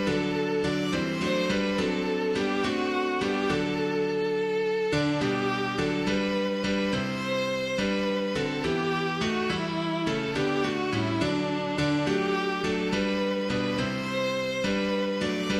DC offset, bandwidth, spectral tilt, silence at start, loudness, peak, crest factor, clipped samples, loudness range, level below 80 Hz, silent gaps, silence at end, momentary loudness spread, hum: under 0.1%; 14 kHz; -5.5 dB/octave; 0 s; -27 LUFS; -14 dBFS; 14 dB; under 0.1%; 1 LU; -52 dBFS; none; 0 s; 2 LU; none